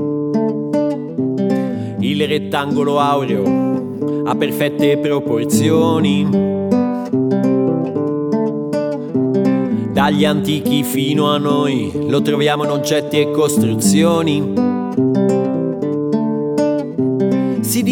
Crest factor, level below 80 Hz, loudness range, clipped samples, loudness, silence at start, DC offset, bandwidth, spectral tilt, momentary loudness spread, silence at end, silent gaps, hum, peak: 14 dB; -56 dBFS; 2 LU; under 0.1%; -16 LUFS; 0 s; under 0.1%; 20 kHz; -6 dB/octave; 5 LU; 0 s; none; none; -2 dBFS